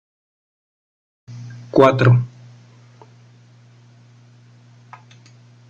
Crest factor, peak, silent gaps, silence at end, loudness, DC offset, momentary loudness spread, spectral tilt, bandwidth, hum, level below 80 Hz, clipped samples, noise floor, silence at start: 22 dB; -2 dBFS; none; 3.45 s; -15 LUFS; under 0.1%; 25 LU; -8 dB/octave; 7.2 kHz; 60 Hz at -40 dBFS; -58 dBFS; under 0.1%; -48 dBFS; 1.3 s